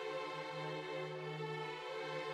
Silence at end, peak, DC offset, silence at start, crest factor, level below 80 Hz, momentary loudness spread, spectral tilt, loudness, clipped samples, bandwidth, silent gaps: 0 s; -32 dBFS; under 0.1%; 0 s; 12 dB; -90 dBFS; 1 LU; -5 dB/octave; -44 LUFS; under 0.1%; 14 kHz; none